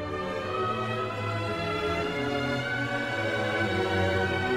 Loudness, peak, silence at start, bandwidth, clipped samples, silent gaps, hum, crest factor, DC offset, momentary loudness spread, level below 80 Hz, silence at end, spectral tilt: -29 LUFS; -14 dBFS; 0 s; 15.5 kHz; under 0.1%; none; none; 14 dB; 0.1%; 4 LU; -52 dBFS; 0 s; -5.5 dB/octave